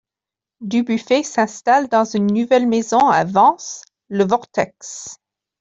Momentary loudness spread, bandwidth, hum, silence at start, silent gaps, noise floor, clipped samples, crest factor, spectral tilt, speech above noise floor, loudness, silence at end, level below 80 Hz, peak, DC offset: 17 LU; 8 kHz; none; 0.6 s; none; -88 dBFS; under 0.1%; 16 dB; -5 dB/octave; 71 dB; -17 LUFS; 0.45 s; -62 dBFS; -2 dBFS; under 0.1%